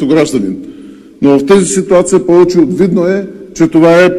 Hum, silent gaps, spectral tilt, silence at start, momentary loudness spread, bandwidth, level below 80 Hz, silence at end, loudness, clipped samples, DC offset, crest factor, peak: none; none; -5.5 dB/octave; 0 s; 11 LU; 13 kHz; -42 dBFS; 0 s; -9 LUFS; 0.6%; under 0.1%; 8 dB; 0 dBFS